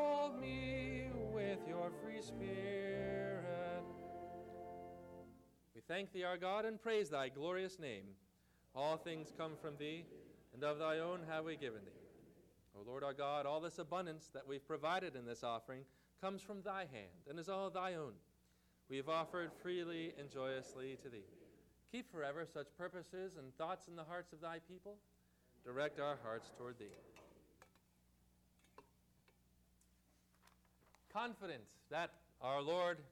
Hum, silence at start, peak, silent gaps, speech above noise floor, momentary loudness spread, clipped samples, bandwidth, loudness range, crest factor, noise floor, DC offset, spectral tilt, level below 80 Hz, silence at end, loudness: 60 Hz at -75 dBFS; 0 s; -32 dBFS; none; 30 dB; 16 LU; under 0.1%; 18 kHz; 6 LU; 16 dB; -75 dBFS; under 0.1%; -5.5 dB/octave; -70 dBFS; 0 s; -46 LUFS